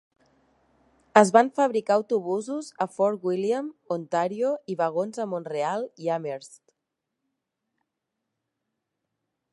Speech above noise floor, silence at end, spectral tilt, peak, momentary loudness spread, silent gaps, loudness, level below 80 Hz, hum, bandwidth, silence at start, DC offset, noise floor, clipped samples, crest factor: 59 dB; 3 s; -5.5 dB/octave; 0 dBFS; 12 LU; none; -25 LUFS; -80 dBFS; none; 11.5 kHz; 1.15 s; under 0.1%; -83 dBFS; under 0.1%; 26 dB